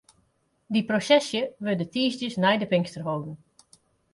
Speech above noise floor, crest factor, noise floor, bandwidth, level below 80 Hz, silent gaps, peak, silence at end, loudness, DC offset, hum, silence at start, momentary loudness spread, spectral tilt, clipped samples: 44 dB; 18 dB; -69 dBFS; 11.5 kHz; -68 dBFS; none; -8 dBFS; 0.8 s; -25 LUFS; under 0.1%; none; 0.7 s; 10 LU; -5 dB/octave; under 0.1%